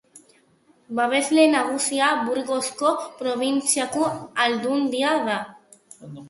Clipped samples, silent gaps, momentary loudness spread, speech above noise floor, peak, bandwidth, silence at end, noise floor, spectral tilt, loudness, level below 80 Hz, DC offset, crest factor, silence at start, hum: under 0.1%; none; 9 LU; 37 dB; -4 dBFS; 12 kHz; 0 s; -59 dBFS; -2.5 dB/octave; -22 LUFS; -70 dBFS; under 0.1%; 18 dB; 0.15 s; none